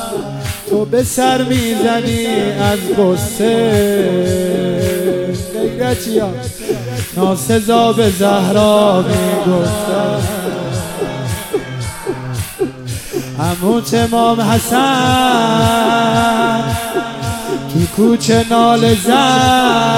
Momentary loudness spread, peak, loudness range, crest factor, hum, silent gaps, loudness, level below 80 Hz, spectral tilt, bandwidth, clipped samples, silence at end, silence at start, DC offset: 10 LU; 0 dBFS; 6 LU; 14 dB; none; none; -14 LUFS; -38 dBFS; -5 dB/octave; 17 kHz; under 0.1%; 0 s; 0 s; under 0.1%